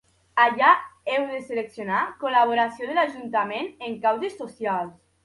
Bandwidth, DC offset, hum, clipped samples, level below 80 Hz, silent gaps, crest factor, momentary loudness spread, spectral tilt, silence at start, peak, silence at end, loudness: 11.5 kHz; under 0.1%; none; under 0.1%; -70 dBFS; none; 20 dB; 12 LU; -5 dB/octave; 0.35 s; -4 dBFS; 0.35 s; -24 LUFS